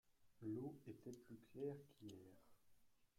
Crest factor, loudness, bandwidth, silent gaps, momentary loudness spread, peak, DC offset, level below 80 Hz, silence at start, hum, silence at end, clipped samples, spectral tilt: 18 dB; -55 LUFS; 16 kHz; none; 11 LU; -38 dBFS; under 0.1%; -86 dBFS; 0.05 s; none; 0.15 s; under 0.1%; -7.5 dB/octave